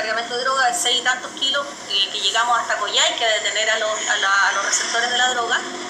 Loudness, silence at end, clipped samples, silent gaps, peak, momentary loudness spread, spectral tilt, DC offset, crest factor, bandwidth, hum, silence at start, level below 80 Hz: -18 LUFS; 0 s; under 0.1%; none; -4 dBFS; 5 LU; 1.5 dB/octave; under 0.1%; 16 dB; 14.5 kHz; none; 0 s; -68 dBFS